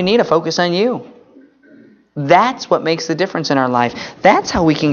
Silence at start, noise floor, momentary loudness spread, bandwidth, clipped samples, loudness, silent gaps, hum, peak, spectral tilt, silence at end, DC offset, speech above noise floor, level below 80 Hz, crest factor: 0 s; -46 dBFS; 7 LU; 7.2 kHz; under 0.1%; -15 LUFS; none; none; 0 dBFS; -5 dB/octave; 0 s; under 0.1%; 31 dB; -46 dBFS; 16 dB